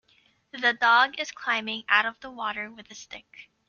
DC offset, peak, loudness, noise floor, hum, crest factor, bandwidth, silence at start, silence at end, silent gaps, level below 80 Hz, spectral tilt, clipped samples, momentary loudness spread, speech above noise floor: under 0.1%; -6 dBFS; -24 LUFS; -64 dBFS; none; 22 dB; 7.2 kHz; 0.55 s; 0.25 s; none; -70 dBFS; -1.5 dB/octave; under 0.1%; 23 LU; 38 dB